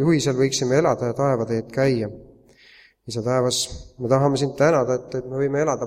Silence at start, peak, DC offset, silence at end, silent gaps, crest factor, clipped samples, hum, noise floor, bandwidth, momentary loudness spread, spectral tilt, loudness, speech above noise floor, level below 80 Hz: 0 s; -4 dBFS; under 0.1%; 0 s; none; 16 dB; under 0.1%; none; -52 dBFS; 15.5 kHz; 10 LU; -5.5 dB/octave; -22 LUFS; 31 dB; -50 dBFS